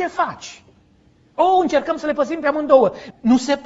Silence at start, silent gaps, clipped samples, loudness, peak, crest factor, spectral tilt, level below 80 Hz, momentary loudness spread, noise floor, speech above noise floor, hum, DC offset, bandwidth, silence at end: 0 s; none; under 0.1%; -18 LUFS; 0 dBFS; 18 dB; -5 dB/octave; -56 dBFS; 12 LU; -54 dBFS; 37 dB; none; under 0.1%; 8 kHz; 0 s